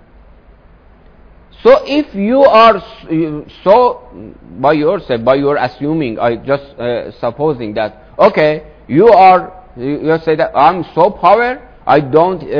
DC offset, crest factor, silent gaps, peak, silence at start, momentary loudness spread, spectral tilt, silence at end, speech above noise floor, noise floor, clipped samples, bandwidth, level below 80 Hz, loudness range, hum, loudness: under 0.1%; 12 dB; none; 0 dBFS; 1.65 s; 12 LU; -8 dB/octave; 0 s; 31 dB; -43 dBFS; 0.7%; 5.4 kHz; -42 dBFS; 5 LU; none; -12 LUFS